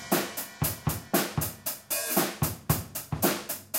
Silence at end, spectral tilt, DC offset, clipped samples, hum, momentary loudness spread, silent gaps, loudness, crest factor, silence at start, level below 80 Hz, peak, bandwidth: 0 s; -4 dB/octave; under 0.1%; under 0.1%; none; 6 LU; none; -29 LUFS; 20 dB; 0 s; -50 dBFS; -10 dBFS; 17 kHz